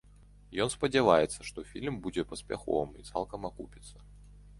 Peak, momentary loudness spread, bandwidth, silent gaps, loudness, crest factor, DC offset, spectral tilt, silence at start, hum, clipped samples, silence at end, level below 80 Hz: -8 dBFS; 19 LU; 11.5 kHz; none; -32 LUFS; 24 dB; under 0.1%; -4.5 dB/octave; 0.5 s; 50 Hz at -50 dBFS; under 0.1%; 0 s; -54 dBFS